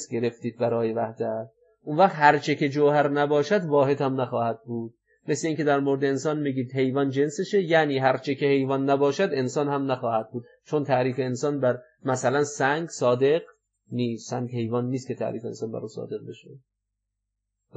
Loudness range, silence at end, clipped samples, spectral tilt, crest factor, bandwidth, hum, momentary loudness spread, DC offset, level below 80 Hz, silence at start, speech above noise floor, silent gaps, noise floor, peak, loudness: 7 LU; 1.2 s; under 0.1%; -6 dB/octave; 20 dB; 8.6 kHz; none; 12 LU; under 0.1%; -80 dBFS; 0 s; 58 dB; none; -82 dBFS; -4 dBFS; -25 LUFS